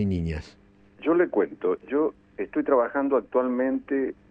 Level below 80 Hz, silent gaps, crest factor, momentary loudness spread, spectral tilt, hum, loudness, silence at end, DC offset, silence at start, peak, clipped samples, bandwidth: -48 dBFS; none; 16 dB; 8 LU; -9 dB/octave; none; -26 LUFS; 0.2 s; under 0.1%; 0 s; -10 dBFS; under 0.1%; 7.8 kHz